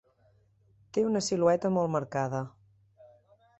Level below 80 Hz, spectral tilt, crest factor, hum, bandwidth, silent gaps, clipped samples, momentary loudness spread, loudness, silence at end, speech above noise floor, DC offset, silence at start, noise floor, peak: -68 dBFS; -5.5 dB/octave; 20 dB; none; 8.4 kHz; none; under 0.1%; 10 LU; -29 LUFS; 1.1 s; 38 dB; under 0.1%; 0.95 s; -66 dBFS; -12 dBFS